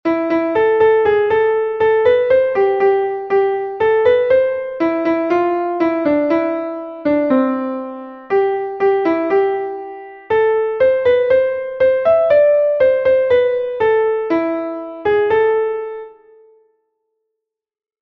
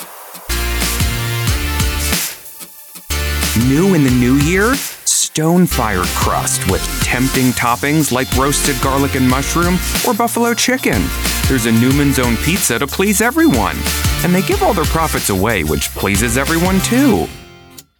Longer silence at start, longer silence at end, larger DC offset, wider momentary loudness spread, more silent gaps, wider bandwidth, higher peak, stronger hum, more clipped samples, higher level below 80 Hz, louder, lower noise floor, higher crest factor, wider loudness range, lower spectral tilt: about the same, 0.05 s vs 0 s; first, 1.9 s vs 0.2 s; neither; first, 10 LU vs 5 LU; neither; second, 5.8 kHz vs 19.5 kHz; about the same, -2 dBFS vs -2 dBFS; neither; neither; second, -54 dBFS vs -26 dBFS; about the same, -15 LUFS vs -14 LUFS; first, -81 dBFS vs -40 dBFS; about the same, 12 dB vs 12 dB; about the same, 4 LU vs 2 LU; first, -7.5 dB/octave vs -4 dB/octave